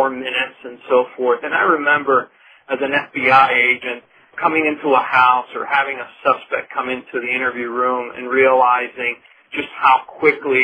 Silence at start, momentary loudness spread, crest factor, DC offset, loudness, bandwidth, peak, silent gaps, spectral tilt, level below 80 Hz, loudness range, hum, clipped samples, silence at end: 0 s; 13 LU; 18 dB; under 0.1%; -17 LUFS; 9.4 kHz; 0 dBFS; none; -5.5 dB/octave; -64 dBFS; 3 LU; none; under 0.1%; 0 s